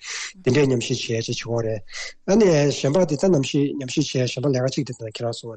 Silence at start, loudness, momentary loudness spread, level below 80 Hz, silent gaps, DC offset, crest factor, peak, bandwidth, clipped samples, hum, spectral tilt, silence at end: 0 s; -22 LUFS; 11 LU; -52 dBFS; none; under 0.1%; 12 dB; -8 dBFS; 9 kHz; under 0.1%; none; -5.5 dB/octave; 0 s